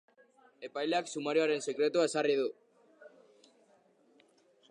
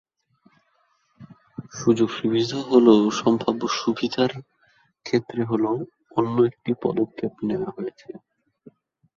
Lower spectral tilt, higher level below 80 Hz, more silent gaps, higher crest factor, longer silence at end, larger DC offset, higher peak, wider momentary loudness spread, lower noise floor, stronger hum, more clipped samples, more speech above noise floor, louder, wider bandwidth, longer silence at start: second, -3.5 dB/octave vs -6 dB/octave; second, under -90 dBFS vs -64 dBFS; neither; about the same, 18 dB vs 20 dB; first, 1.6 s vs 1 s; neither; second, -18 dBFS vs -2 dBFS; second, 9 LU vs 21 LU; about the same, -67 dBFS vs -67 dBFS; neither; neither; second, 36 dB vs 45 dB; second, -32 LUFS vs -23 LUFS; first, 11 kHz vs 7.4 kHz; second, 0.6 s vs 1.2 s